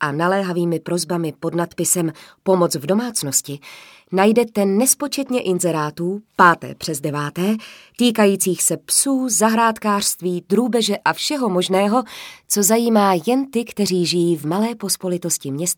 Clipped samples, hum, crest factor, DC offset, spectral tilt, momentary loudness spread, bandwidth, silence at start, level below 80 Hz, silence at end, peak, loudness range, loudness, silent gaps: under 0.1%; none; 18 dB; under 0.1%; -3.5 dB/octave; 9 LU; 19 kHz; 0 s; -64 dBFS; 0.05 s; 0 dBFS; 3 LU; -18 LUFS; none